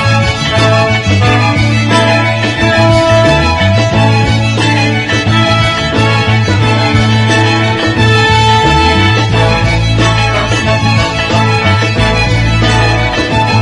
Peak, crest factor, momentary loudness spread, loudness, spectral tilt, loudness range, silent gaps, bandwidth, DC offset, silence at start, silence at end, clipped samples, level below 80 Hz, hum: 0 dBFS; 8 dB; 3 LU; -9 LUFS; -5.5 dB/octave; 1 LU; none; 11 kHz; under 0.1%; 0 s; 0 s; 0.1%; -24 dBFS; none